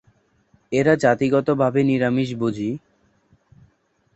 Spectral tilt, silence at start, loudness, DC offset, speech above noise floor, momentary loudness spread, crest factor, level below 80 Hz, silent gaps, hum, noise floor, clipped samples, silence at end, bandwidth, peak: -7 dB/octave; 0.7 s; -20 LUFS; under 0.1%; 45 dB; 10 LU; 18 dB; -58 dBFS; none; none; -64 dBFS; under 0.1%; 1.35 s; 8.2 kHz; -4 dBFS